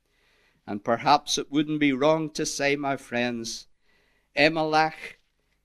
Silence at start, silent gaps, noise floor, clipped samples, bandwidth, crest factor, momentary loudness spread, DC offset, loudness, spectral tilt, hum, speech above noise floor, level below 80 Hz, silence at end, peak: 0.65 s; none; -65 dBFS; under 0.1%; 13.5 kHz; 22 dB; 13 LU; under 0.1%; -25 LUFS; -3.5 dB/octave; none; 40 dB; -60 dBFS; 0.55 s; -4 dBFS